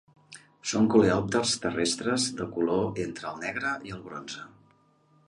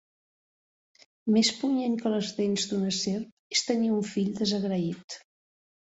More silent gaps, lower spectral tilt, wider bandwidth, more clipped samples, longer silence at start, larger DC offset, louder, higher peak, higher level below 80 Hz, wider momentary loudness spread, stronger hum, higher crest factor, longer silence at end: second, none vs 3.32-3.50 s, 5.04-5.08 s; about the same, -4 dB/octave vs -4.5 dB/octave; first, 11.5 kHz vs 8.2 kHz; neither; second, 0.3 s vs 1.25 s; neither; about the same, -27 LUFS vs -28 LUFS; first, -8 dBFS vs -12 dBFS; first, -58 dBFS vs -70 dBFS; first, 16 LU vs 11 LU; neither; about the same, 20 dB vs 18 dB; about the same, 0.8 s vs 0.8 s